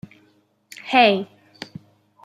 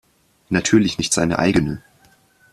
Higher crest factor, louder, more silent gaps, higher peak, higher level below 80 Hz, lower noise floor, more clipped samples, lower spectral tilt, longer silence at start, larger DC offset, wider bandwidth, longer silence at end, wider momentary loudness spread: about the same, 22 dB vs 20 dB; about the same, -18 LUFS vs -18 LUFS; neither; about the same, -2 dBFS vs 0 dBFS; second, -72 dBFS vs -46 dBFS; first, -61 dBFS vs -55 dBFS; neither; about the same, -5 dB/octave vs -4.5 dB/octave; first, 0.85 s vs 0.5 s; neither; about the same, 15 kHz vs 14 kHz; first, 1 s vs 0.75 s; first, 23 LU vs 9 LU